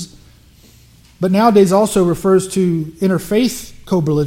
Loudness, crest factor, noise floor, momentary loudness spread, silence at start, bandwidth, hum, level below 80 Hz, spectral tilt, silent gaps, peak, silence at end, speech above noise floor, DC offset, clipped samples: -15 LUFS; 16 dB; -46 dBFS; 9 LU; 0 s; 16.5 kHz; none; -44 dBFS; -6.5 dB/octave; none; 0 dBFS; 0 s; 32 dB; under 0.1%; under 0.1%